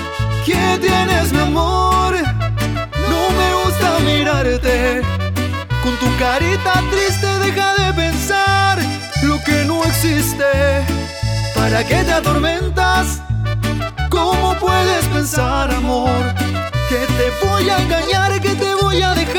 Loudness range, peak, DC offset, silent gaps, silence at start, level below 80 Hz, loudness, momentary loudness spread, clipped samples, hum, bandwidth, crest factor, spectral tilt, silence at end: 1 LU; 0 dBFS; under 0.1%; none; 0 s; -26 dBFS; -16 LUFS; 5 LU; under 0.1%; none; 19 kHz; 14 dB; -5 dB/octave; 0 s